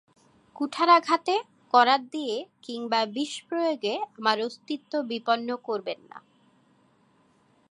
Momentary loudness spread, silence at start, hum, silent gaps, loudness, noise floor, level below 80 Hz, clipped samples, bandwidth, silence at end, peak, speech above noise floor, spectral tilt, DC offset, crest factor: 14 LU; 0.55 s; none; none; -26 LUFS; -64 dBFS; -84 dBFS; under 0.1%; 11 kHz; 1.5 s; -6 dBFS; 38 dB; -3 dB/octave; under 0.1%; 22 dB